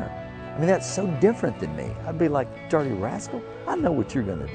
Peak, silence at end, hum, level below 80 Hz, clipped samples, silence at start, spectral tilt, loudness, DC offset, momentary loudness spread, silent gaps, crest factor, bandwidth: -8 dBFS; 0 s; none; -48 dBFS; under 0.1%; 0 s; -6.5 dB/octave; -26 LUFS; under 0.1%; 11 LU; none; 18 dB; 9.4 kHz